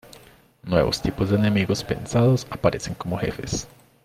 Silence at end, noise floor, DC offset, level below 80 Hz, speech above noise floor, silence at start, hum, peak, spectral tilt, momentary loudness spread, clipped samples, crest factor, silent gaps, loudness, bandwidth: 0.4 s; -51 dBFS; under 0.1%; -44 dBFS; 29 dB; 0.15 s; none; -4 dBFS; -6 dB/octave; 10 LU; under 0.1%; 20 dB; none; -23 LUFS; 15.5 kHz